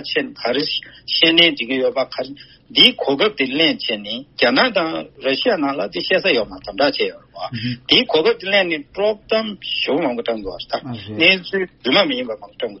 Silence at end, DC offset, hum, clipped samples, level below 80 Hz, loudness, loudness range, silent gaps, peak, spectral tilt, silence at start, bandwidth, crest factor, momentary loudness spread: 0 s; under 0.1%; none; under 0.1%; -54 dBFS; -17 LUFS; 4 LU; none; 0 dBFS; -1 dB/octave; 0 s; 6 kHz; 18 dB; 13 LU